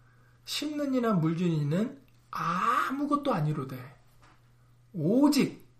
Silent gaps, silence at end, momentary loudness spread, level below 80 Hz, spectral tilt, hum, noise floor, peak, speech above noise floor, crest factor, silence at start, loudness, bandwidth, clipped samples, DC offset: none; 0.15 s; 14 LU; -66 dBFS; -6 dB/octave; none; -60 dBFS; -12 dBFS; 32 dB; 18 dB; 0.45 s; -28 LUFS; 15.5 kHz; under 0.1%; under 0.1%